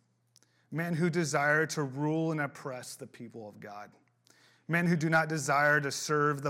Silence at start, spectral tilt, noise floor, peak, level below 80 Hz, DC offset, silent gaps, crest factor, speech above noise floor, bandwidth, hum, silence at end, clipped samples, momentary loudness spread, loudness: 0.7 s; -5 dB/octave; -68 dBFS; -14 dBFS; -78 dBFS; under 0.1%; none; 18 dB; 38 dB; 16.5 kHz; none; 0 s; under 0.1%; 19 LU; -30 LUFS